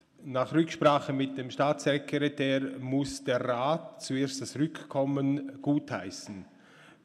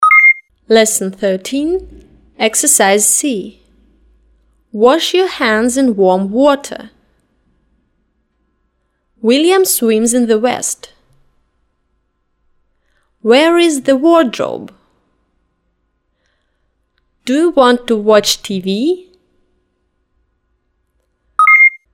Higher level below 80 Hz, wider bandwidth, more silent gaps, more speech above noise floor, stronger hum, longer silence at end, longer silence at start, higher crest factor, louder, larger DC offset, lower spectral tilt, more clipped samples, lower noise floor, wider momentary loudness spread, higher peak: second, -68 dBFS vs -52 dBFS; second, 12.5 kHz vs 17 kHz; neither; second, 26 dB vs 53 dB; neither; about the same, 0.15 s vs 0.15 s; first, 0.2 s vs 0 s; first, 20 dB vs 14 dB; second, -30 LUFS vs -11 LUFS; neither; first, -5.5 dB/octave vs -2.5 dB/octave; neither; second, -56 dBFS vs -64 dBFS; second, 10 LU vs 13 LU; second, -10 dBFS vs 0 dBFS